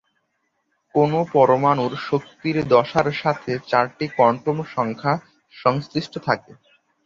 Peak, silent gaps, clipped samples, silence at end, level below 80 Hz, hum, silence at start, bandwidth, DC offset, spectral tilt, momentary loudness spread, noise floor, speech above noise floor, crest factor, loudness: -2 dBFS; none; under 0.1%; 0.5 s; -58 dBFS; none; 0.95 s; 7.4 kHz; under 0.1%; -7 dB/octave; 8 LU; -72 dBFS; 51 dB; 20 dB; -21 LUFS